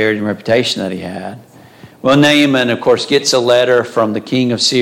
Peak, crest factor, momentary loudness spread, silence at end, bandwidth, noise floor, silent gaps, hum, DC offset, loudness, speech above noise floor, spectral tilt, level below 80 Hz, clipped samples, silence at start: 0 dBFS; 12 dB; 12 LU; 0 s; 16 kHz; -39 dBFS; none; none; under 0.1%; -13 LUFS; 26 dB; -4 dB/octave; -56 dBFS; under 0.1%; 0 s